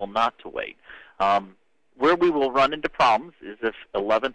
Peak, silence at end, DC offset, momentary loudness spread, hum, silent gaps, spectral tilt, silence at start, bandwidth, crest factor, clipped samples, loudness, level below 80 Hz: -8 dBFS; 0 s; under 0.1%; 13 LU; none; none; -5 dB/octave; 0 s; 9.6 kHz; 16 dB; under 0.1%; -23 LUFS; -54 dBFS